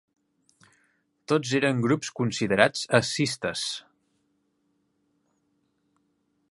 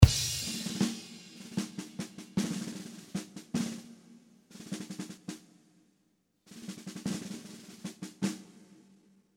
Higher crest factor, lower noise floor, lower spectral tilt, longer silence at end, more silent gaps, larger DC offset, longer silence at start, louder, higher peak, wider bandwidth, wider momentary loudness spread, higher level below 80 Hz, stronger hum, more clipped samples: about the same, 28 dB vs 30 dB; about the same, -73 dBFS vs -74 dBFS; about the same, -4.5 dB/octave vs -5 dB/octave; first, 2.7 s vs 0.7 s; neither; neither; first, 1.3 s vs 0 s; first, -25 LUFS vs -36 LUFS; about the same, -2 dBFS vs -4 dBFS; second, 11.5 kHz vs 16 kHz; second, 8 LU vs 16 LU; second, -64 dBFS vs -44 dBFS; neither; neither